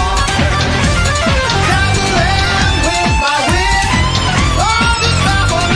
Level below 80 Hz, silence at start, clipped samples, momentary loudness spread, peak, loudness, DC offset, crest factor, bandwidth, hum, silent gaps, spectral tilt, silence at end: -20 dBFS; 0 s; under 0.1%; 1 LU; 0 dBFS; -12 LUFS; under 0.1%; 12 dB; 11 kHz; none; none; -4 dB/octave; 0 s